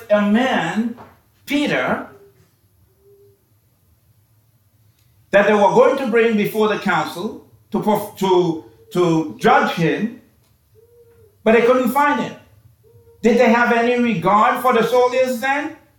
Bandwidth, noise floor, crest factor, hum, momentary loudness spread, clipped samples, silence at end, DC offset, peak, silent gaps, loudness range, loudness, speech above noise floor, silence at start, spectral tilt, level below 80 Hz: 19 kHz; -59 dBFS; 16 dB; none; 12 LU; under 0.1%; 0.25 s; under 0.1%; -2 dBFS; none; 9 LU; -17 LUFS; 43 dB; 0 s; -6 dB/octave; -56 dBFS